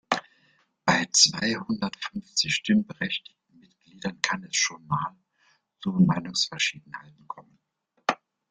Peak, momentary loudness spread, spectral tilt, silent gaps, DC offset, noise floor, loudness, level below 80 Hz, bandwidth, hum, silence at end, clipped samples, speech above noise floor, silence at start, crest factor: -2 dBFS; 19 LU; -3 dB/octave; none; under 0.1%; -67 dBFS; -25 LUFS; -64 dBFS; 10 kHz; none; 0.35 s; under 0.1%; 40 dB; 0.1 s; 26 dB